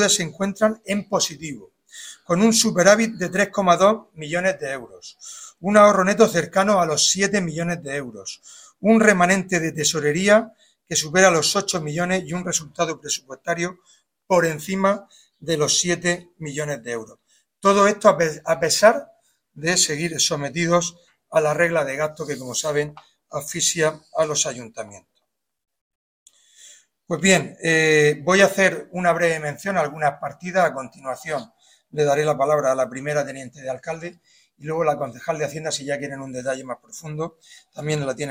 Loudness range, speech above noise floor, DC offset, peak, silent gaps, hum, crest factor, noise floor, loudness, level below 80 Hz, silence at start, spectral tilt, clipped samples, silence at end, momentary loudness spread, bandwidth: 7 LU; 52 dB; under 0.1%; 0 dBFS; 25.81-26.26 s; none; 22 dB; -73 dBFS; -20 LUFS; -60 dBFS; 0 s; -3.5 dB/octave; under 0.1%; 0 s; 16 LU; 16 kHz